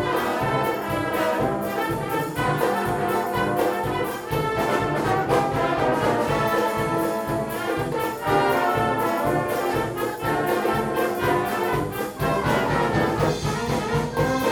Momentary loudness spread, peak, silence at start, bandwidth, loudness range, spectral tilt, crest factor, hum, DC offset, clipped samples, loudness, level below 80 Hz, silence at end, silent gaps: 4 LU; -8 dBFS; 0 s; over 20 kHz; 1 LU; -5.5 dB/octave; 16 dB; none; under 0.1%; under 0.1%; -23 LUFS; -44 dBFS; 0 s; none